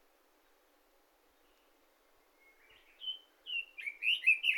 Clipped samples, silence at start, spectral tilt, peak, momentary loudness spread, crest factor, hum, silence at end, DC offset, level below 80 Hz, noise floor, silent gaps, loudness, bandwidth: under 0.1%; 3 s; 3 dB/octave; -16 dBFS; 16 LU; 22 dB; none; 0 s; under 0.1%; -82 dBFS; -70 dBFS; none; -33 LUFS; 18 kHz